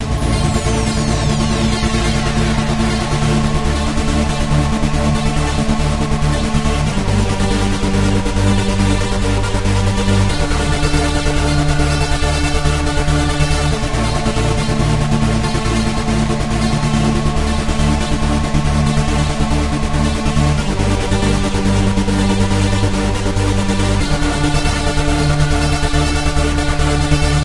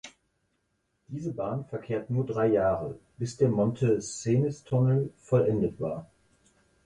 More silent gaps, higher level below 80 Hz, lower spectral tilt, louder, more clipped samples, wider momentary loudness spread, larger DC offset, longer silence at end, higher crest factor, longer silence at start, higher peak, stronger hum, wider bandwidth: neither; first, -20 dBFS vs -58 dBFS; second, -5.5 dB/octave vs -7.5 dB/octave; first, -16 LUFS vs -28 LUFS; neither; second, 2 LU vs 12 LU; first, 2% vs under 0.1%; second, 0 s vs 0.8 s; about the same, 14 dB vs 18 dB; about the same, 0 s vs 0.05 s; first, 0 dBFS vs -12 dBFS; neither; about the same, 11.5 kHz vs 10.5 kHz